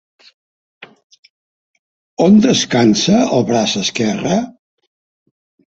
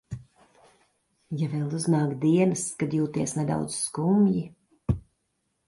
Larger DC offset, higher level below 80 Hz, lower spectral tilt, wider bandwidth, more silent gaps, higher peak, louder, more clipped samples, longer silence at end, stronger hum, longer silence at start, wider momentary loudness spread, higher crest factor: neither; about the same, -52 dBFS vs -50 dBFS; second, -4.5 dB/octave vs -6.5 dB/octave; second, 8 kHz vs 11.5 kHz; first, 1.04-1.10 s, 1.19-1.23 s, 1.30-2.17 s vs none; first, -2 dBFS vs -10 dBFS; first, -13 LUFS vs -26 LUFS; neither; first, 1.3 s vs 0.65 s; neither; first, 0.8 s vs 0.1 s; second, 8 LU vs 13 LU; about the same, 16 dB vs 16 dB